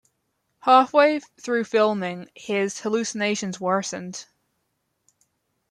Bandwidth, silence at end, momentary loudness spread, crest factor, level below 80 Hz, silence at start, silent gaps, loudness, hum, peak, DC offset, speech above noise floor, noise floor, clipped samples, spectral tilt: 11.5 kHz; 1.45 s; 15 LU; 20 dB; -74 dBFS; 0.65 s; none; -22 LUFS; none; -4 dBFS; under 0.1%; 52 dB; -75 dBFS; under 0.1%; -4 dB/octave